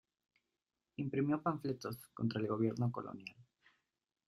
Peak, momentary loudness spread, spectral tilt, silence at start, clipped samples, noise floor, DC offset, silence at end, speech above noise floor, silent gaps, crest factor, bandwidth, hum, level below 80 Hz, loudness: -22 dBFS; 14 LU; -7.5 dB/octave; 1 s; under 0.1%; under -90 dBFS; under 0.1%; 0.85 s; over 52 dB; none; 18 dB; 13.5 kHz; none; -76 dBFS; -39 LUFS